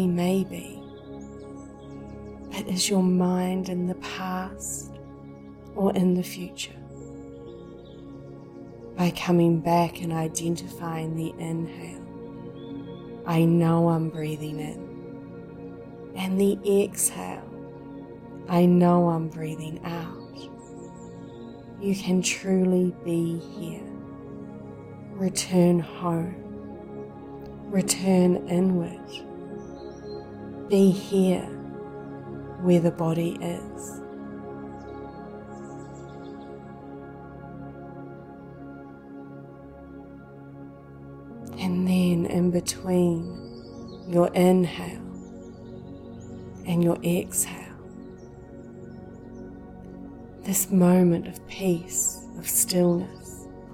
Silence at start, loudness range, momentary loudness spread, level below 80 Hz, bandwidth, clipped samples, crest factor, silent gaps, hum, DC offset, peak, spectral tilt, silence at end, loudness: 0 s; 15 LU; 21 LU; -56 dBFS; 16.5 kHz; under 0.1%; 20 dB; none; none; under 0.1%; -8 dBFS; -5.5 dB/octave; 0 s; -25 LUFS